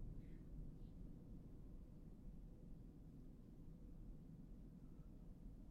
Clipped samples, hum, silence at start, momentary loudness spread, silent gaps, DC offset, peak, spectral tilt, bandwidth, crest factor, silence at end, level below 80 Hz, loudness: under 0.1%; none; 0 s; 4 LU; none; under 0.1%; -44 dBFS; -9 dB/octave; 8.2 kHz; 14 dB; 0 s; -58 dBFS; -61 LUFS